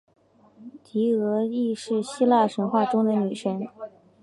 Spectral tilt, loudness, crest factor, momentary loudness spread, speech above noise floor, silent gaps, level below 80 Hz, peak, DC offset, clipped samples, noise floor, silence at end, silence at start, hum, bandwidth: -6.5 dB/octave; -24 LUFS; 18 dB; 12 LU; 29 dB; none; -76 dBFS; -8 dBFS; under 0.1%; under 0.1%; -52 dBFS; 0.35 s; 0.6 s; none; 11.5 kHz